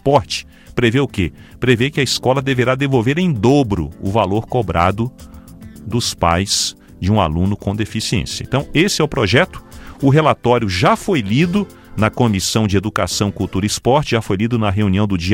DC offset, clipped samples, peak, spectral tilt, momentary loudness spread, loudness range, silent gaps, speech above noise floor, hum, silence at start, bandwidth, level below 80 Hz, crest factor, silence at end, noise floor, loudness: under 0.1%; under 0.1%; 0 dBFS; -5 dB/octave; 7 LU; 3 LU; none; 20 dB; none; 0.05 s; 16.5 kHz; -38 dBFS; 16 dB; 0 s; -36 dBFS; -17 LUFS